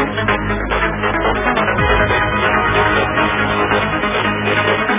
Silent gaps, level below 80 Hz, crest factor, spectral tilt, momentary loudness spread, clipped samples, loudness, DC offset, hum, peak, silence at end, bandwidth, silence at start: none; -28 dBFS; 14 dB; -9 dB/octave; 3 LU; under 0.1%; -15 LUFS; under 0.1%; none; 0 dBFS; 0 s; 3.8 kHz; 0 s